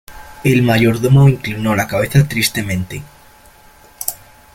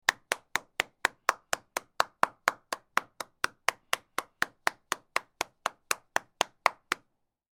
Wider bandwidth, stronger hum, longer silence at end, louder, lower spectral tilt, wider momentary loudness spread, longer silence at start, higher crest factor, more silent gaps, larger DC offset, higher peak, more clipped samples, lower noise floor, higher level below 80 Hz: second, 17 kHz vs 19 kHz; neither; second, 0.4 s vs 0.65 s; first, -15 LUFS vs -32 LUFS; first, -6 dB/octave vs 0 dB/octave; first, 13 LU vs 7 LU; about the same, 0.1 s vs 0.1 s; second, 16 dB vs 32 dB; neither; neither; about the same, 0 dBFS vs -2 dBFS; neither; second, -45 dBFS vs -73 dBFS; first, -40 dBFS vs -70 dBFS